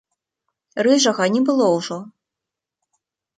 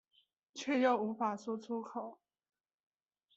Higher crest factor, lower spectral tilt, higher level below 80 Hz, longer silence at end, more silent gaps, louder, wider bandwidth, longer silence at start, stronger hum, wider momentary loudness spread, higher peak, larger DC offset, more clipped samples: about the same, 18 dB vs 20 dB; about the same, -4 dB/octave vs -5 dB/octave; first, -72 dBFS vs -88 dBFS; about the same, 1.3 s vs 1.25 s; neither; first, -18 LUFS vs -36 LUFS; first, 9.4 kHz vs 8 kHz; first, 0.75 s vs 0.55 s; neither; about the same, 15 LU vs 15 LU; first, -4 dBFS vs -20 dBFS; neither; neither